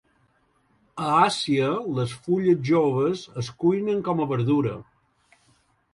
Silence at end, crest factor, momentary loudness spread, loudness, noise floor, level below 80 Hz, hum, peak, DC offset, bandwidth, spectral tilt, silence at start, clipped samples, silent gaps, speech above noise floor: 1.1 s; 20 dB; 10 LU; -23 LUFS; -65 dBFS; -62 dBFS; none; -4 dBFS; under 0.1%; 11.5 kHz; -6.5 dB/octave; 0.95 s; under 0.1%; none; 43 dB